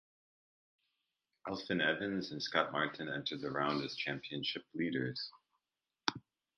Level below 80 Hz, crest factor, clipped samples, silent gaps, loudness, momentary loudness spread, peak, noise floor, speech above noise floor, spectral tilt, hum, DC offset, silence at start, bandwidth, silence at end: -76 dBFS; 30 dB; under 0.1%; none; -38 LUFS; 10 LU; -10 dBFS; under -90 dBFS; over 52 dB; -5 dB/octave; none; under 0.1%; 1.45 s; 8.6 kHz; 0.35 s